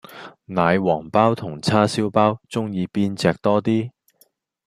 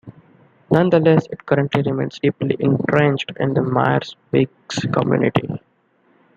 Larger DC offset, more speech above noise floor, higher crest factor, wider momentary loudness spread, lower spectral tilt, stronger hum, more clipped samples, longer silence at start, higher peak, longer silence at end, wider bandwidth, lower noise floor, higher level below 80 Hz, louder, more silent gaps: neither; about the same, 41 dB vs 42 dB; about the same, 20 dB vs 18 dB; about the same, 8 LU vs 7 LU; about the same, -6.5 dB/octave vs -7.5 dB/octave; neither; neither; about the same, 0.1 s vs 0.05 s; about the same, -2 dBFS vs -2 dBFS; about the same, 0.8 s vs 0.8 s; first, 15 kHz vs 7.6 kHz; about the same, -61 dBFS vs -60 dBFS; about the same, -58 dBFS vs -56 dBFS; about the same, -20 LUFS vs -19 LUFS; neither